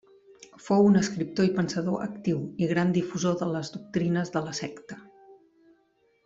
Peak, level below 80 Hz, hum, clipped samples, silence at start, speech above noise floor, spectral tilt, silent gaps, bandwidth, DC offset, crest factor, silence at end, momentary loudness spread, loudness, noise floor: -10 dBFS; -64 dBFS; none; under 0.1%; 0.4 s; 41 dB; -6.5 dB/octave; none; 7.8 kHz; under 0.1%; 18 dB; 0.9 s; 14 LU; -27 LUFS; -67 dBFS